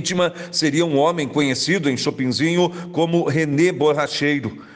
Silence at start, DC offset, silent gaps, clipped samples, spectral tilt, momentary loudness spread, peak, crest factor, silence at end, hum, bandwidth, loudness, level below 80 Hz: 0 s; under 0.1%; none; under 0.1%; -5 dB/octave; 4 LU; -6 dBFS; 14 dB; 0 s; none; 10 kHz; -19 LUFS; -60 dBFS